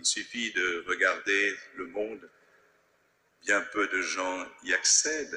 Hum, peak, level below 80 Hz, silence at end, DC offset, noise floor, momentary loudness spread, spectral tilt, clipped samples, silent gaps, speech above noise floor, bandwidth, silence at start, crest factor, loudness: none; -10 dBFS; -70 dBFS; 0 s; under 0.1%; -69 dBFS; 16 LU; 0.5 dB/octave; under 0.1%; none; 40 dB; 12 kHz; 0 s; 20 dB; -27 LUFS